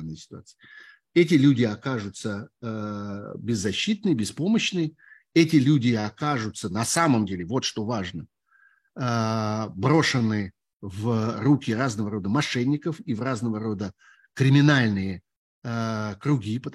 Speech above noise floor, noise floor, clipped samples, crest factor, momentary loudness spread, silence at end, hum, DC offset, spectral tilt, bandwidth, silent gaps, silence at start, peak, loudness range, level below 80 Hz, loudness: 38 dB; -62 dBFS; under 0.1%; 20 dB; 15 LU; 0 s; none; under 0.1%; -5.5 dB/octave; 12.5 kHz; 10.73-10.80 s, 15.36-15.62 s; 0 s; -4 dBFS; 3 LU; -62 dBFS; -24 LUFS